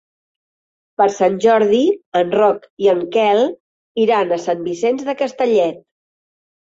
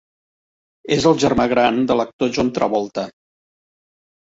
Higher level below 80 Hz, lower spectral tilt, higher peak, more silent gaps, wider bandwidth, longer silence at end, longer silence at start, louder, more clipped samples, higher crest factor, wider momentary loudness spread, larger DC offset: second, -64 dBFS vs -48 dBFS; about the same, -5 dB/octave vs -5 dB/octave; about the same, -2 dBFS vs -2 dBFS; first, 2.06-2.12 s, 2.70-2.77 s, 3.60-3.95 s vs 2.13-2.19 s; about the same, 7.8 kHz vs 8 kHz; second, 0.95 s vs 1.15 s; first, 1 s vs 0.85 s; about the same, -16 LUFS vs -18 LUFS; neither; about the same, 16 dB vs 18 dB; about the same, 8 LU vs 9 LU; neither